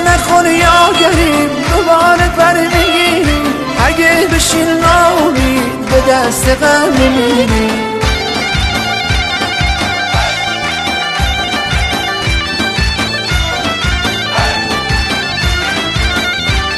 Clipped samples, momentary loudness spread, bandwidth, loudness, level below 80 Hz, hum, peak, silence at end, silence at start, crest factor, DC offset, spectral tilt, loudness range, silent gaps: under 0.1%; 6 LU; 14 kHz; -11 LUFS; -22 dBFS; none; 0 dBFS; 0 s; 0 s; 12 dB; 0.1%; -4 dB/octave; 4 LU; none